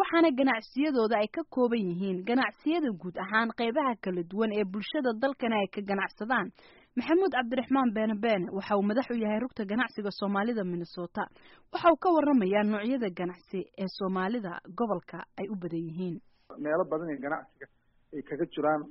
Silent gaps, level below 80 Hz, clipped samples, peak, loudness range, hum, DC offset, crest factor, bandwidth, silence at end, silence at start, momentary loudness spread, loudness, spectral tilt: none; -68 dBFS; under 0.1%; -12 dBFS; 6 LU; none; under 0.1%; 18 dB; 5.8 kHz; 0 s; 0 s; 12 LU; -30 LUFS; -4.5 dB/octave